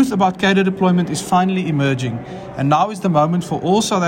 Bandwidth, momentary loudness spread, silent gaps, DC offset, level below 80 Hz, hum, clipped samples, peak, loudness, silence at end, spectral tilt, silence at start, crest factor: 16 kHz; 7 LU; none; under 0.1%; -50 dBFS; none; under 0.1%; -4 dBFS; -17 LUFS; 0 s; -5.5 dB/octave; 0 s; 12 dB